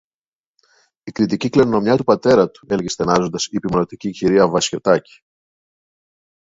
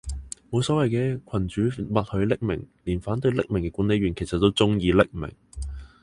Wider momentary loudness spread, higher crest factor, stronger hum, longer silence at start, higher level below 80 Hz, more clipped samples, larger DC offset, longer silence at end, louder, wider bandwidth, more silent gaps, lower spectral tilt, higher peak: second, 8 LU vs 15 LU; about the same, 18 dB vs 22 dB; neither; first, 1.05 s vs 0.05 s; second, -50 dBFS vs -40 dBFS; neither; neither; first, 1.5 s vs 0.15 s; first, -17 LUFS vs -24 LUFS; second, 8 kHz vs 11 kHz; neither; second, -5 dB/octave vs -6.5 dB/octave; first, 0 dBFS vs -4 dBFS